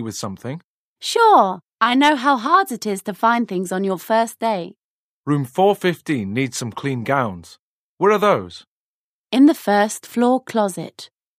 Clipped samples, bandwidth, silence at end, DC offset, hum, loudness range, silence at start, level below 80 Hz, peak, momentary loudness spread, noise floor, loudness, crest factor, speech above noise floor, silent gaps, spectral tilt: under 0.1%; 15.5 kHz; 0.35 s; under 0.1%; none; 5 LU; 0 s; -66 dBFS; -2 dBFS; 14 LU; under -90 dBFS; -18 LUFS; 18 dB; over 72 dB; 0.64-0.96 s, 1.73-1.78 s, 4.78-5.24 s, 7.59-7.97 s, 8.67-9.26 s; -5 dB/octave